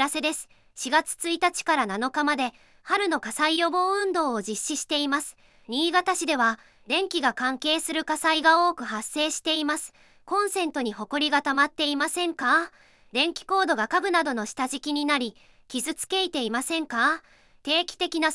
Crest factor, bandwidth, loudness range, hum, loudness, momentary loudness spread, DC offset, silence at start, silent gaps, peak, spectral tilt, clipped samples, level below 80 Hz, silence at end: 20 dB; 12 kHz; 2 LU; none; -25 LUFS; 8 LU; under 0.1%; 0 s; none; -6 dBFS; -1.5 dB/octave; under 0.1%; -66 dBFS; 0 s